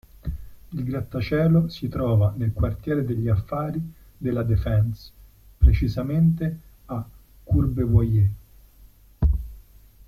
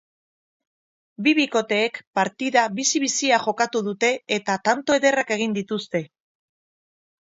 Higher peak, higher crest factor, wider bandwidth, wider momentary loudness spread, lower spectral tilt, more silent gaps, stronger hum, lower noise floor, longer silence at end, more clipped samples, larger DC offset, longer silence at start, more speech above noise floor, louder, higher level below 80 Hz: about the same, -6 dBFS vs -4 dBFS; about the same, 18 dB vs 20 dB; first, 13.5 kHz vs 8 kHz; first, 16 LU vs 6 LU; first, -9.5 dB/octave vs -3 dB/octave; second, none vs 2.07-2.13 s; neither; second, -51 dBFS vs under -90 dBFS; second, 0.45 s vs 1.25 s; neither; neither; second, 0.25 s vs 1.2 s; second, 30 dB vs over 68 dB; about the same, -24 LUFS vs -22 LUFS; first, -30 dBFS vs -72 dBFS